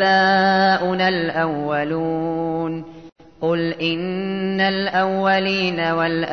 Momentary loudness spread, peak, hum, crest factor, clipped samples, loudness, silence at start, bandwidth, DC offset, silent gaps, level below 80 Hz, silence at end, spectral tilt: 9 LU; -6 dBFS; none; 14 dB; under 0.1%; -19 LUFS; 0 s; 6.6 kHz; 0.2%; 3.12-3.16 s; -58 dBFS; 0 s; -6.5 dB/octave